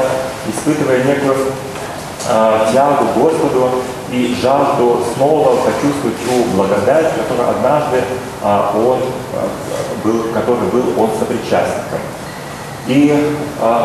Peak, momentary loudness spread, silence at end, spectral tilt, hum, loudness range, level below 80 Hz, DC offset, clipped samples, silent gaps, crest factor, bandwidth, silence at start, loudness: 0 dBFS; 9 LU; 0 s; -5.5 dB/octave; none; 3 LU; -46 dBFS; under 0.1%; under 0.1%; none; 14 dB; 13.5 kHz; 0 s; -15 LUFS